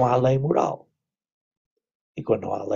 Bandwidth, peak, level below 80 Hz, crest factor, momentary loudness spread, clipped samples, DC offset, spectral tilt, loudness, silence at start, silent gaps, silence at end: 7.2 kHz; -6 dBFS; -56 dBFS; 18 dB; 17 LU; under 0.1%; under 0.1%; -8 dB/octave; -23 LUFS; 0 s; 1.32-1.51 s, 1.57-1.76 s, 1.95-2.15 s; 0 s